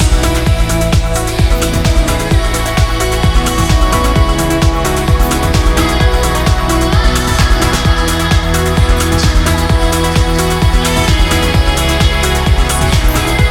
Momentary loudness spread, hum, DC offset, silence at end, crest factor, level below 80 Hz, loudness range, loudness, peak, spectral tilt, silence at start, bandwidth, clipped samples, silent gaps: 2 LU; none; under 0.1%; 0 s; 10 dB; -14 dBFS; 1 LU; -12 LUFS; 0 dBFS; -4.5 dB/octave; 0 s; 17.5 kHz; under 0.1%; none